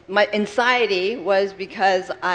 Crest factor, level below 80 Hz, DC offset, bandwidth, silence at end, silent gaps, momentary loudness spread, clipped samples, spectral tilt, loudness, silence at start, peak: 20 dB; -62 dBFS; under 0.1%; 9.6 kHz; 0 s; none; 4 LU; under 0.1%; -4 dB/octave; -20 LUFS; 0.1 s; -2 dBFS